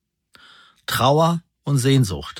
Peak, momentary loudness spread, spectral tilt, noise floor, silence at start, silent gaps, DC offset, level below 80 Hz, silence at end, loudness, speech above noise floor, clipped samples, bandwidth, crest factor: -2 dBFS; 10 LU; -5.5 dB/octave; -53 dBFS; 0.9 s; none; under 0.1%; -48 dBFS; 0 s; -19 LUFS; 35 dB; under 0.1%; 17.5 kHz; 18 dB